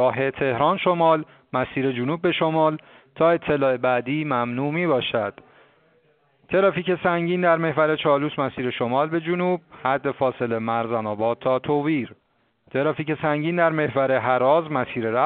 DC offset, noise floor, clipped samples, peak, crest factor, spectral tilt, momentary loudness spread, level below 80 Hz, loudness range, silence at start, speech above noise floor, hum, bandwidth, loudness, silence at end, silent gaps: under 0.1%; -62 dBFS; under 0.1%; -6 dBFS; 18 dB; -4.5 dB/octave; 6 LU; -60 dBFS; 3 LU; 0 s; 41 dB; none; 4.5 kHz; -22 LUFS; 0 s; none